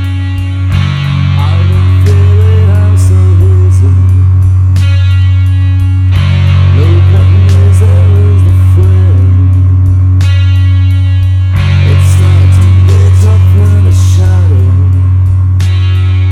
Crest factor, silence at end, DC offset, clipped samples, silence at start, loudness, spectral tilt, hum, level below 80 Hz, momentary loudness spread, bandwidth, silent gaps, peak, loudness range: 4 dB; 0 s; under 0.1%; 1%; 0 s; -7 LUFS; -7.5 dB/octave; none; -24 dBFS; 3 LU; 9.2 kHz; none; 0 dBFS; 1 LU